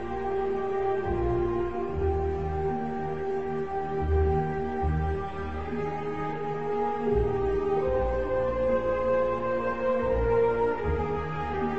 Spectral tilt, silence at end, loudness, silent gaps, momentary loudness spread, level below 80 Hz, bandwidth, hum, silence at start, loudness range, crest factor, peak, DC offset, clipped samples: -9 dB/octave; 0 s; -28 LUFS; none; 6 LU; -38 dBFS; 7.6 kHz; none; 0 s; 3 LU; 14 dB; -14 dBFS; 0.9%; under 0.1%